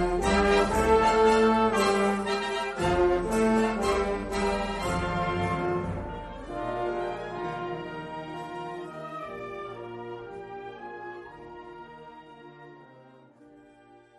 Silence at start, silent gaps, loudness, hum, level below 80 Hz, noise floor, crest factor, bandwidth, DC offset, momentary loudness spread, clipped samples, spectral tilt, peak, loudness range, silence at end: 0 s; none; -27 LUFS; none; -44 dBFS; -55 dBFS; 18 dB; 13 kHz; under 0.1%; 21 LU; under 0.1%; -5.5 dB/octave; -10 dBFS; 19 LU; 1.15 s